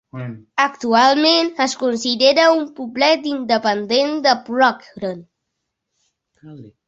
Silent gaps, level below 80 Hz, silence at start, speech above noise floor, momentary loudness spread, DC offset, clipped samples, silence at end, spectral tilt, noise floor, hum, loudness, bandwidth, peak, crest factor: none; -64 dBFS; 0.15 s; 60 dB; 15 LU; under 0.1%; under 0.1%; 0.2 s; -3.5 dB/octave; -77 dBFS; none; -16 LUFS; 8.2 kHz; 0 dBFS; 18 dB